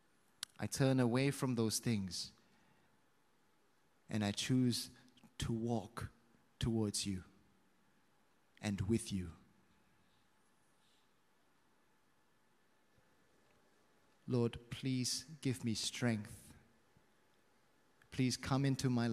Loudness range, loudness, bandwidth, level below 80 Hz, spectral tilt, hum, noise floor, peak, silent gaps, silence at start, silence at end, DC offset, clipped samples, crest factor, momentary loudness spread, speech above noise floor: 7 LU; -38 LUFS; 15 kHz; -64 dBFS; -5 dB/octave; none; -76 dBFS; -20 dBFS; none; 0.6 s; 0 s; under 0.1%; under 0.1%; 20 dB; 15 LU; 39 dB